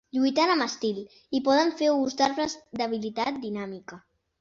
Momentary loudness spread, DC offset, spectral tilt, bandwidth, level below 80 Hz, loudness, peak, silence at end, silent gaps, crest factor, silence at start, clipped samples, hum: 13 LU; under 0.1%; -4 dB/octave; 7.6 kHz; -66 dBFS; -26 LUFS; -10 dBFS; 0.4 s; none; 18 dB; 0.15 s; under 0.1%; none